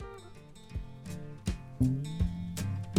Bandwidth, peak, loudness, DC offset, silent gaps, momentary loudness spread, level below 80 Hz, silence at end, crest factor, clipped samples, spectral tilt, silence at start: 16 kHz; -14 dBFS; -36 LUFS; under 0.1%; none; 18 LU; -44 dBFS; 0 s; 20 dB; under 0.1%; -6.5 dB/octave; 0 s